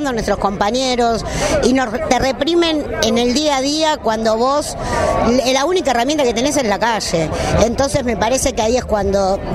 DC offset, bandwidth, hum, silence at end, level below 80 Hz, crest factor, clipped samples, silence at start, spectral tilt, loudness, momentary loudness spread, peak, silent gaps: under 0.1%; 16 kHz; none; 0 s; -32 dBFS; 16 dB; under 0.1%; 0 s; -4 dB/octave; -16 LUFS; 3 LU; 0 dBFS; none